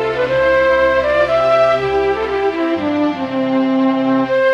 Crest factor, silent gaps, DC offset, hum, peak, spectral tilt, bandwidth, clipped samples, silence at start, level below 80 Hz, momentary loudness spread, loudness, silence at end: 12 dB; none; under 0.1%; none; -2 dBFS; -6.5 dB/octave; 8.4 kHz; under 0.1%; 0 s; -42 dBFS; 5 LU; -15 LUFS; 0 s